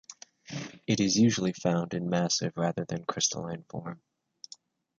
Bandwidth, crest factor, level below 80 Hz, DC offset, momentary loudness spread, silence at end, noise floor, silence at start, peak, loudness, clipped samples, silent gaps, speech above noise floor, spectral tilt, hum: 7.8 kHz; 20 dB; -64 dBFS; under 0.1%; 23 LU; 1.05 s; -55 dBFS; 0.1 s; -12 dBFS; -29 LUFS; under 0.1%; none; 26 dB; -4.5 dB/octave; none